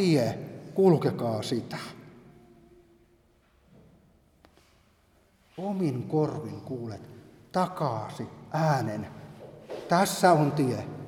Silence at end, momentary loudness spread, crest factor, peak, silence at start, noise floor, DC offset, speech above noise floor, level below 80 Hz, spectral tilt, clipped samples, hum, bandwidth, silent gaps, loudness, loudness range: 0 s; 21 LU; 22 dB; -8 dBFS; 0 s; -64 dBFS; under 0.1%; 37 dB; -66 dBFS; -6 dB/octave; under 0.1%; none; 18 kHz; none; -28 LUFS; 12 LU